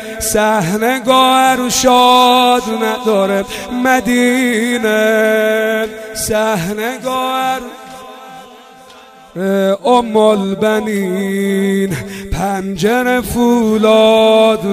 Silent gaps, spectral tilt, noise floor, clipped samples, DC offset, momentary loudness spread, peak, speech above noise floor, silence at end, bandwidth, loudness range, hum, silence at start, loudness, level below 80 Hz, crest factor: none; -4 dB/octave; -39 dBFS; under 0.1%; under 0.1%; 11 LU; 0 dBFS; 26 dB; 0 s; 16 kHz; 8 LU; none; 0 s; -13 LUFS; -38 dBFS; 12 dB